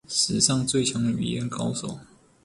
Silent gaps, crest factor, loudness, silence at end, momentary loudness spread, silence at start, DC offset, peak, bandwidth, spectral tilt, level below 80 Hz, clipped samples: none; 22 dB; -24 LUFS; 0.4 s; 13 LU; 0.1 s; under 0.1%; -4 dBFS; 11.5 kHz; -3.5 dB/octave; -56 dBFS; under 0.1%